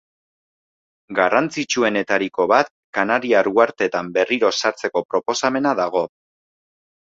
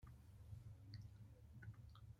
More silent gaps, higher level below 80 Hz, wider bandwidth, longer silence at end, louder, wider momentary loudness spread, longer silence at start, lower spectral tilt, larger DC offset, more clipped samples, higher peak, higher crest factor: first, 2.71-2.93 s, 5.05-5.09 s vs none; about the same, -64 dBFS vs -68 dBFS; second, 7.8 kHz vs 15.5 kHz; first, 0.95 s vs 0 s; first, -19 LUFS vs -61 LUFS; about the same, 6 LU vs 5 LU; first, 1.1 s vs 0 s; second, -3.5 dB/octave vs -6.5 dB/octave; neither; neither; first, -2 dBFS vs -42 dBFS; about the same, 18 dB vs 16 dB